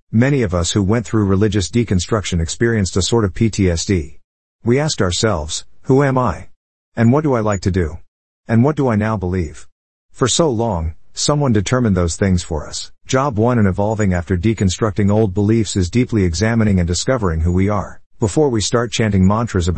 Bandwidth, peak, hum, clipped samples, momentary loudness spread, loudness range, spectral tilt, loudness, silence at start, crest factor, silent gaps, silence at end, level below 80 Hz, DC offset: 8.8 kHz; -2 dBFS; none; under 0.1%; 7 LU; 2 LU; -5.5 dB/octave; -17 LUFS; 0.1 s; 14 dB; 4.24-4.59 s, 6.56-6.92 s, 8.08-8.44 s, 9.72-10.09 s, 18.06-18.10 s; 0 s; -36 dBFS; 1%